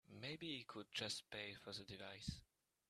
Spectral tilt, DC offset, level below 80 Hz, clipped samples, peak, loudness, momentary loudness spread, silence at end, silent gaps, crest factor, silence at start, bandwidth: -3.5 dB/octave; under 0.1%; -70 dBFS; under 0.1%; -30 dBFS; -50 LUFS; 7 LU; 0.45 s; none; 22 dB; 0.1 s; 13.5 kHz